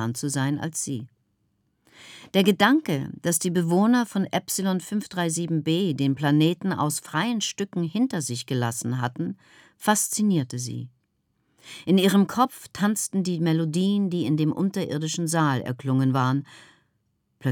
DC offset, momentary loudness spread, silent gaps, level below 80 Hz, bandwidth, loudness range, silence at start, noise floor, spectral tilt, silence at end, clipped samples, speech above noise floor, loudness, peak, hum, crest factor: under 0.1%; 9 LU; none; -72 dBFS; 19.5 kHz; 3 LU; 0 s; -72 dBFS; -5 dB/octave; 0 s; under 0.1%; 48 dB; -24 LUFS; -6 dBFS; none; 20 dB